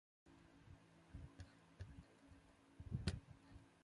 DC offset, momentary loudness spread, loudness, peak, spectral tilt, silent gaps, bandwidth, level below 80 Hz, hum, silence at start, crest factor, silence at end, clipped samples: under 0.1%; 20 LU; -54 LUFS; -28 dBFS; -6 dB/octave; none; 11 kHz; -62 dBFS; none; 0.25 s; 28 dB; 0 s; under 0.1%